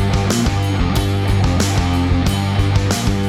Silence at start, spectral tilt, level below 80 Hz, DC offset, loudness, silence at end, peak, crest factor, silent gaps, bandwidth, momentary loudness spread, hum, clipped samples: 0 s; -5.5 dB/octave; -24 dBFS; under 0.1%; -17 LUFS; 0 s; -4 dBFS; 12 dB; none; 15.5 kHz; 1 LU; none; under 0.1%